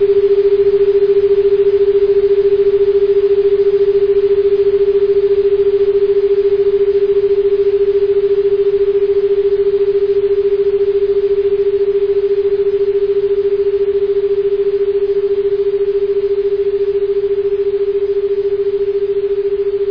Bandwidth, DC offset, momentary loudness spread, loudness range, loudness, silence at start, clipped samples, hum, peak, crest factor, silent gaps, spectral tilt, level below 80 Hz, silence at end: 5.2 kHz; under 0.1%; 4 LU; 4 LU; -13 LUFS; 0 s; under 0.1%; none; -4 dBFS; 8 dB; none; -8.5 dB/octave; -42 dBFS; 0 s